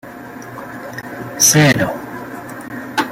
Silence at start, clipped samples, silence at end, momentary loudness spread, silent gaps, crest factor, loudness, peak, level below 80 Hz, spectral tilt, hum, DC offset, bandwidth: 0.05 s; under 0.1%; 0 s; 21 LU; none; 18 dB; -13 LUFS; 0 dBFS; -50 dBFS; -3 dB/octave; none; under 0.1%; 16.5 kHz